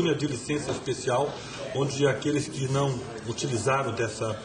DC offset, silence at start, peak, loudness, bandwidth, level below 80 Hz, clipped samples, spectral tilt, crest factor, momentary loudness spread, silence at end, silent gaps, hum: under 0.1%; 0 s; -10 dBFS; -28 LUFS; 10 kHz; -56 dBFS; under 0.1%; -5 dB/octave; 18 dB; 7 LU; 0 s; none; none